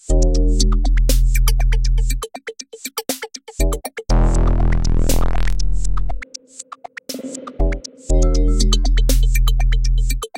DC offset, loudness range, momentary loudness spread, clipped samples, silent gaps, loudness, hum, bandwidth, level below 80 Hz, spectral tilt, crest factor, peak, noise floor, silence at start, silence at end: under 0.1%; 4 LU; 13 LU; under 0.1%; none; -20 LUFS; none; 16.5 kHz; -16 dBFS; -5 dB/octave; 14 dB; -2 dBFS; -37 dBFS; 0 s; 0 s